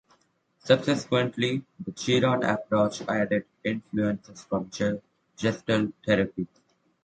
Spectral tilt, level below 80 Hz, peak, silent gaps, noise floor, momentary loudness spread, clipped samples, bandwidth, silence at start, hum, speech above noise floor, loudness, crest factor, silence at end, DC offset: -5.5 dB/octave; -60 dBFS; -6 dBFS; none; -67 dBFS; 10 LU; under 0.1%; 9.2 kHz; 0.65 s; none; 40 dB; -27 LUFS; 22 dB; 0.6 s; under 0.1%